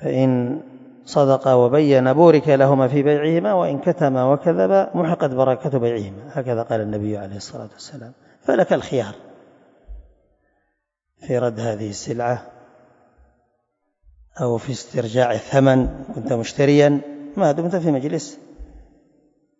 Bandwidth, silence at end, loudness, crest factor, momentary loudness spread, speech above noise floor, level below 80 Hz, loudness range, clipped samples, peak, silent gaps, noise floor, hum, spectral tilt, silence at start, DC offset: 8 kHz; 0.8 s; -19 LUFS; 20 dB; 14 LU; 56 dB; -48 dBFS; 11 LU; under 0.1%; 0 dBFS; none; -74 dBFS; none; -7 dB/octave; 0 s; under 0.1%